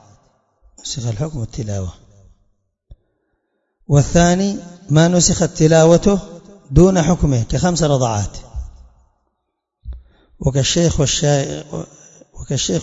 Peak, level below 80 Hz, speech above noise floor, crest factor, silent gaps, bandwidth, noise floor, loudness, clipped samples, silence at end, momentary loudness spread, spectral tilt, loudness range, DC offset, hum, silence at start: 0 dBFS; -32 dBFS; 60 dB; 18 dB; none; 8 kHz; -75 dBFS; -16 LUFS; under 0.1%; 0 s; 20 LU; -5 dB/octave; 11 LU; under 0.1%; none; 0.85 s